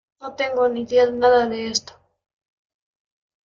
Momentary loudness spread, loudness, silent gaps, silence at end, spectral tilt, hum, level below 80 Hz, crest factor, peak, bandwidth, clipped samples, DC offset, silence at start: 9 LU; -20 LUFS; none; 1.7 s; -3 dB/octave; none; -62 dBFS; 18 dB; -4 dBFS; 7.6 kHz; under 0.1%; under 0.1%; 0.2 s